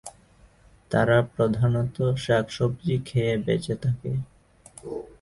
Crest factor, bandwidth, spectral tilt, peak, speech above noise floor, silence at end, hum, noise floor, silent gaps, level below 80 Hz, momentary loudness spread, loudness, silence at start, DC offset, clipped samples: 20 dB; 11.5 kHz; -7 dB/octave; -6 dBFS; 31 dB; 0.15 s; none; -56 dBFS; none; -50 dBFS; 15 LU; -25 LUFS; 0.05 s; under 0.1%; under 0.1%